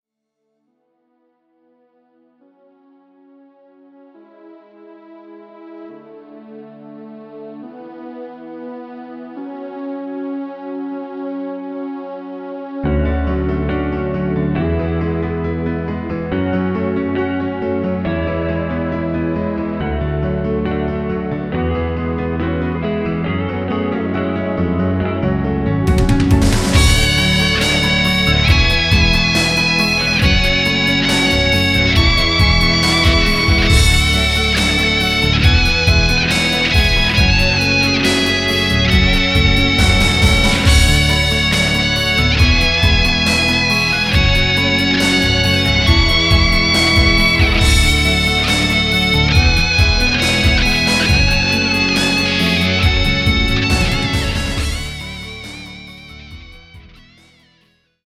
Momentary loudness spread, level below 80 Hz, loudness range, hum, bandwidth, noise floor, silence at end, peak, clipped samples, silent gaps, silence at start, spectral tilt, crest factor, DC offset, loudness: 15 LU; -22 dBFS; 14 LU; none; 15.5 kHz; -73 dBFS; 1.35 s; 0 dBFS; under 0.1%; none; 4.45 s; -4.5 dB/octave; 16 dB; under 0.1%; -14 LUFS